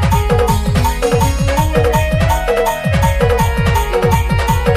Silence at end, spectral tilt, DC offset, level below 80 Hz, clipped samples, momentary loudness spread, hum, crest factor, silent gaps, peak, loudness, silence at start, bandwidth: 0 s; -6 dB/octave; under 0.1%; -20 dBFS; under 0.1%; 2 LU; none; 10 dB; none; -2 dBFS; -14 LUFS; 0 s; 15.5 kHz